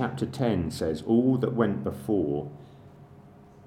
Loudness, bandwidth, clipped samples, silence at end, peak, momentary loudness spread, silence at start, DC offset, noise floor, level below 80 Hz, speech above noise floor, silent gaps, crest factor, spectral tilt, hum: -27 LUFS; 15 kHz; under 0.1%; 0.05 s; -8 dBFS; 9 LU; 0 s; under 0.1%; -51 dBFS; -54 dBFS; 25 dB; none; 20 dB; -7.5 dB/octave; none